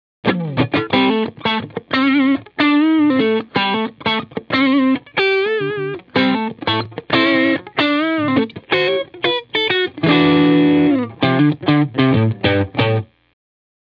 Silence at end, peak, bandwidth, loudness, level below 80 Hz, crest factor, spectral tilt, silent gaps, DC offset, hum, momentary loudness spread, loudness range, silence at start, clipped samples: 0.8 s; -2 dBFS; 5.4 kHz; -16 LUFS; -54 dBFS; 14 dB; -8 dB/octave; none; under 0.1%; none; 7 LU; 3 LU; 0.25 s; under 0.1%